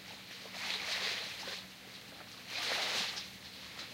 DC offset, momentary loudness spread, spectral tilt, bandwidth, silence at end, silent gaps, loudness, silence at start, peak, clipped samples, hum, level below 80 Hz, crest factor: under 0.1%; 15 LU; -0.5 dB/octave; 16 kHz; 0 s; none; -38 LUFS; 0 s; -22 dBFS; under 0.1%; none; -74 dBFS; 20 dB